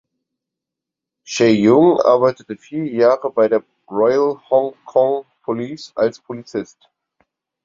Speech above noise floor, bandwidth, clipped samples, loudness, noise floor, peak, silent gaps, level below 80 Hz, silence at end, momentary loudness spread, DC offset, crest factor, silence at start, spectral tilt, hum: 68 dB; 7.6 kHz; under 0.1%; -17 LUFS; -85 dBFS; 0 dBFS; none; -62 dBFS; 1 s; 16 LU; under 0.1%; 18 dB; 1.3 s; -6 dB/octave; none